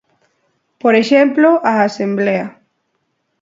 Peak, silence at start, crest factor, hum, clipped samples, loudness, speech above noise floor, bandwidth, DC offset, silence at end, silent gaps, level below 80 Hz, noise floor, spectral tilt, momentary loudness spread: 0 dBFS; 0.85 s; 16 dB; none; under 0.1%; -13 LUFS; 55 dB; 7.8 kHz; under 0.1%; 0.9 s; none; -66 dBFS; -68 dBFS; -6 dB/octave; 8 LU